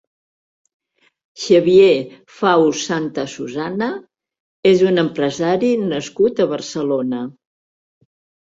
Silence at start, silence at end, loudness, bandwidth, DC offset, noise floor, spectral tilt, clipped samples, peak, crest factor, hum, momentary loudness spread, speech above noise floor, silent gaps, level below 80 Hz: 1.35 s; 1.2 s; -17 LUFS; 7.8 kHz; under 0.1%; under -90 dBFS; -5.5 dB/octave; under 0.1%; 0 dBFS; 18 dB; none; 13 LU; over 74 dB; 4.40-4.63 s; -60 dBFS